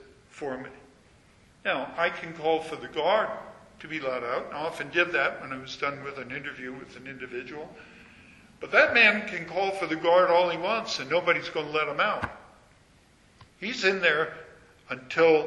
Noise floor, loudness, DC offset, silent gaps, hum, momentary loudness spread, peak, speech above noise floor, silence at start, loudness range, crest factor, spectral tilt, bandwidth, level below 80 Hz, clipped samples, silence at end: -59 dBFS; -26 LUFS; under 0.1%; none; none; 19 LU; -6 dBFS; 32 dB; 0.35 s; 8 LU; 22 dB; -4 dB/octave; 11.5 kHz; -64 dBFS; under 0.1%; 0 s